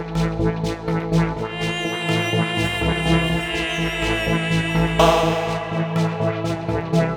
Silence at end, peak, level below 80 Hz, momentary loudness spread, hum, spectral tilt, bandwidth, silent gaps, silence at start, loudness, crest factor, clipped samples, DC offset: 0 s; 0 dBFS; -34 dBFS; 7 LU; none; -5.5 dB/octave; 15 kHz; none; 0 s; -21 LUFS; 20 dB; under 0.1%; under 0.1%